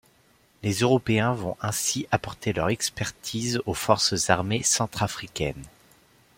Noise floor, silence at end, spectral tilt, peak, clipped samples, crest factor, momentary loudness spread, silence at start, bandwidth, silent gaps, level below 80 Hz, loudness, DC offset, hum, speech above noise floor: -61 dBFS; 0.7 s; -3.5 dB/octave; -4 dBFS; under 0.1%; 24 dB; 9 LU; 0.65 s; 16.5 kHz; none; -52 dBFS; -25 LUFS; under 0.1%; none; 36 dB